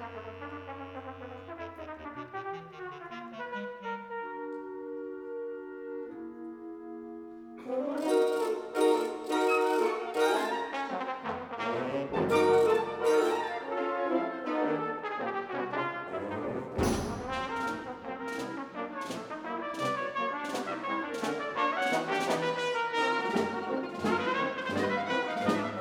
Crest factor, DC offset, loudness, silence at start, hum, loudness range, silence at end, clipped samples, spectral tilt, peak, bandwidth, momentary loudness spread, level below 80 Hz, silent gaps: 18 dB; under 0.1%; -32 LUFS; 0 s; none; 12 LU; 0 s; under 0.1%; -5 dB/octave; -14 dBFS; 19 kHz; 15 LU; -58 dBFS; none